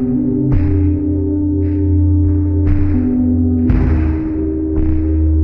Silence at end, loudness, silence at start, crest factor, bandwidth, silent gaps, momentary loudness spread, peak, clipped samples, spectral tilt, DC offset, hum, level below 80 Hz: 0 s; -15 LUFS; 0 s; 12 dB; 2.8 kHz; none; 4 LU; -2 dBFS; under 0.1%; -13 dB/octave; under 0.1%; none; -20 dBFS